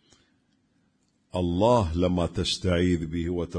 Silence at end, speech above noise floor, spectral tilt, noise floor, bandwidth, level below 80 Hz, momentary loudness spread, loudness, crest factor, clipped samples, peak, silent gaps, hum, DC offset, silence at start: 0 s; 44 dB; -6 dB/octave; -69 dBFS; 10.5 kHz; -42 dBFS; 8 LU; -25 LUFS; 18 dB; under 0.1%; -10 dBFS; none; none; under 0.1%; 1.35 s